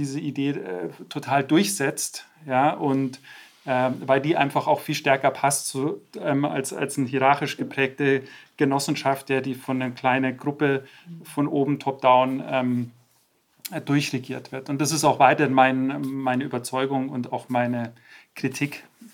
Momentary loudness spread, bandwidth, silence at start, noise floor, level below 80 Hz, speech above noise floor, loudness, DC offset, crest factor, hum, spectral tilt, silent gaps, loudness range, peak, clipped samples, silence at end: 14 LU; 17.5 kHz; 0 s; -65 dBFS; -76 dBFS; 41 dB; -24 LUFS; under 0.1%; 22 dB; none; -5 dB/octave; none; 3 LU; -2 dBFS; under 0.1%; 0.05 s